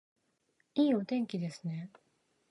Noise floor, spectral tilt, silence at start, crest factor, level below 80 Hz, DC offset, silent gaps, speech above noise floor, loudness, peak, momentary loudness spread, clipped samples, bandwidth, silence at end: -77 dBFS; -7.5 dB/octave; 0.75 s; 18 dB; -82 dBFS; under 0.1%; none; 44 dB; -34 LUFS; -18 dBFS; 13 LU; under 0.1%; 11.5 kHz; 0.65 s